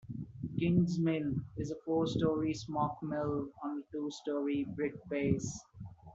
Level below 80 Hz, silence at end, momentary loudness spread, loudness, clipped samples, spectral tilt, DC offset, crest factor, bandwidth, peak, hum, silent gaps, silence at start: -60 dBFS; 0 s; 11 LU; -35 LUFS; under 0.1%; -7 dB/octave; under 0.1%; 18 dB; 8 kHz; -16 dBFS; none; none; 0.05 s